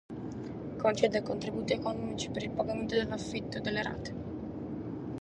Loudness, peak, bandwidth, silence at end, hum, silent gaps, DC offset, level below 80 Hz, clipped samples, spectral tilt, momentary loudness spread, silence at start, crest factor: -34 LUFS; -12 dBFS; 11 kHz; 0 s; none; none; under 0.1%; -56 dBFS; under 0.1%; -5.5 dB/octave; 11 LU; 0.1 s; 22 dB